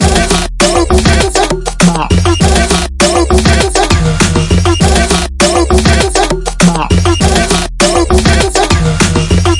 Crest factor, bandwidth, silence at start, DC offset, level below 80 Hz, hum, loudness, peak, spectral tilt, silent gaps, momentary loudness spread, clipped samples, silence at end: 8 dB; 12 kHz; 0 s; under 0.1%; -16 dBFS; none; -9 LUFS; 0 dBFS; -4.5 dB/octave; none; 2 LU; 0.5%; 0 s